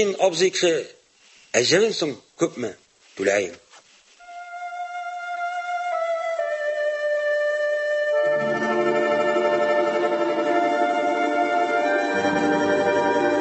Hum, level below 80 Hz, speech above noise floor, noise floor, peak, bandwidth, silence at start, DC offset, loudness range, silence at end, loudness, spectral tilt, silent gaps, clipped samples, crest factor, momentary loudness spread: none; -66 dBFS; 33 dB; -54 dBFS; -4 dBFS; 8.4 kHz; 0 s; under 0.1%; 7 LU; 0 s; -22 LUFS; -3.5 dB/octave; none; under 0.1%; 18 dB; 11 LU